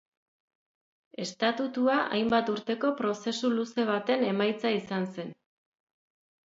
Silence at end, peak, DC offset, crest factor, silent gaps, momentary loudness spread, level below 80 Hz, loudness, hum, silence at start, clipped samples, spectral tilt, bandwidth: 1.15 s; -10 dBFS; under 0.1%; 20 dB; none; 11 LU; -72 dBFS; -29 LUFS; none; 1.2 s; under 0.1%; -5 dB/octave; 7.8 kHz